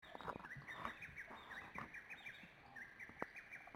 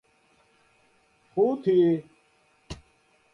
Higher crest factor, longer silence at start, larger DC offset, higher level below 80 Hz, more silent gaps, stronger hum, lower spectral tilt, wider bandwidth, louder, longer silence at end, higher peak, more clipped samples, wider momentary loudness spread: first, 28 dB vs 16 dB; second, 0 s vs 1.35 s; neither; second, -74 dBFS vs -58 dBFS; neither; neither; second, -4.5 dB/octave vs -8.5 dB/octave; first, 16.5 kHz vs 7.2 kHz; second, -53 LUFS vs -24 LUFS; second, 0 s vs 0.6 s; second, -26 dBFS vs -12 dBFS; neither; second, 6 LU vs 23 LU